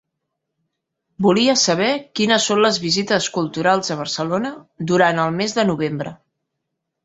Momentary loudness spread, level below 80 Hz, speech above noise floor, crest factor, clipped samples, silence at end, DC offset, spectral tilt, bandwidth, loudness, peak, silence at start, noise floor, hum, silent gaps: 9 LU; -60 dBFS; 59 dB; 18 dB; under 0.1%; 0.9 s; under 0.1%; -4 dB/octave; 8 kHz; -18 LUFS; -2 dBFS; 1.2 s; -78 dBFS; none; none